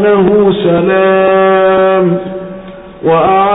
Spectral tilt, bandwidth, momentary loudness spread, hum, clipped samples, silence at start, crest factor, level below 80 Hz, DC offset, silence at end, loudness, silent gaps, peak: -12.5 dB/octave; 4 kHz; 14 LU; none; under 0.1%; 0 s; 8 dB; -42 dBFS; under 0.1%; 0 s; -9 LUFS; none; 0 dBFS